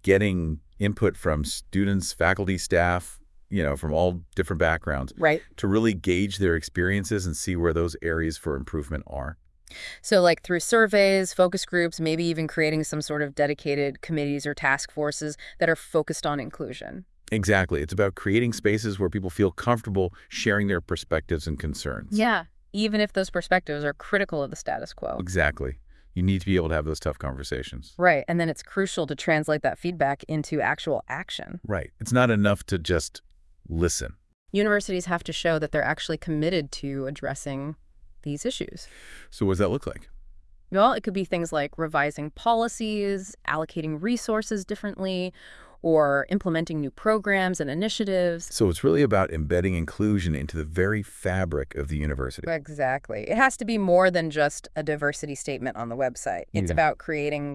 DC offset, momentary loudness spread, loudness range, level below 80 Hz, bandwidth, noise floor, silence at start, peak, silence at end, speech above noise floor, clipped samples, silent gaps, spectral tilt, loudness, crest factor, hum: under 0.1%; 10 LU; 4 LU; -44 dBFS; 12 kHz; -48 dBFS; 0.05 s; -4 dBFS; 0 s; 23 dB; under 0.1%; 34.34-34.46 s; -5.5 dB/octave; -26 LUFS; 22 dB; none